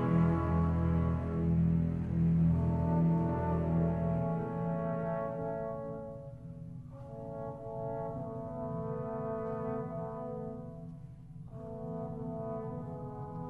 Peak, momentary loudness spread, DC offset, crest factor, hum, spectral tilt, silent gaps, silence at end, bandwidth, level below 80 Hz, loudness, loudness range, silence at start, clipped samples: -18 dBFS; 17 LU; under 0.1%; 16 dB; none; -11.5 dB/octave; none; 0 s; 3.2 kHz; -48 dBFS; -34 LUFS; 11 LU; 0 s; under 0.1%